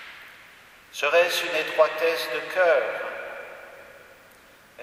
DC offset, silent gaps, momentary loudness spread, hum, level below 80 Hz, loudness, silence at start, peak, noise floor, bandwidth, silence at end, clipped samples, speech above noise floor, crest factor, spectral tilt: under 0.1%; none; 23 LU; none; -70 dBFS; -23 LUFS; 0 s; -6 dBFS; -53 dBFS; 15.5 kHz; 0 s; under 0.1%; 30 dB; 20 dB; -1 dB/octave